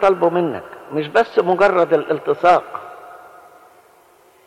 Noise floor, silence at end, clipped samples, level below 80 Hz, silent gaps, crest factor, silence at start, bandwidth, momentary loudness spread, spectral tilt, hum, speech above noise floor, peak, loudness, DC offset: -51 dBFS; 1.3 s; under 0.1%; -58 dBFS; none; 14 dB; 0 s; 13 kHz; 18 LU; -6.5 dB/octave; none; 35 dB; -4 dBFS; -17 LUFS; under 0.1%